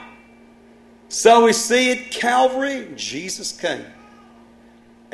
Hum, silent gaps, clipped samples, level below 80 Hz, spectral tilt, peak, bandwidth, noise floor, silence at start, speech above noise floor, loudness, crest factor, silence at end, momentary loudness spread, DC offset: none; none; under 0.1%; -62 dBFS; -2 dB/octave; 0 dBFS; 12.5 kHz; -49 dBFS; 0 s; 31 dB; -18 LUFS; 20 dB; 1.3 s; 14 LU; under 0.1%